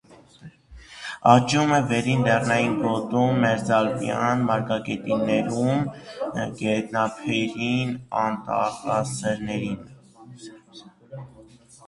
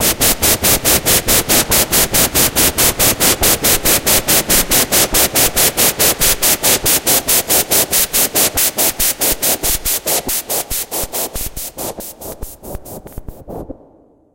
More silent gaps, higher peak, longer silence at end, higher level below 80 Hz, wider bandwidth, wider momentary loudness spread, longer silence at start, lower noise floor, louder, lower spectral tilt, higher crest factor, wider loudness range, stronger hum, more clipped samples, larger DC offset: neither; about the same, 0 dBFS vs 0 dBFS; second, 0.45 s vs 0.6 s; second, -56 dBFS vs -30 dBFS; second, 11.5 kHz vs 17.5 kHz; about the same, 16 LU vs 17 LU; about the same, 0.1 s vs 0 s; about the same, -50 dBFS vs -48 dBFS; second, -23 LUFS vs -11 LUFS; first, -6 dB/octave vs -1.5 dB/octave; first, 24 dB vs 14 dB; second, 7 LU vs 10 LU; neither; neither; neither